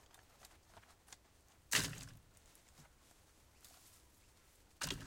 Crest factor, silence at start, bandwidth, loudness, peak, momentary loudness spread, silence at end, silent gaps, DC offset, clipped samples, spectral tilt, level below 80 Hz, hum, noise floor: 30 dB; 0.15 s; 16.5 kHz; -40 LUFS; -18 dBFS; 30 LU; 0 s; none; under 0.1%; under 0.1%; -1.5 dB/octave; -66 dBFS; none; -68 dBFS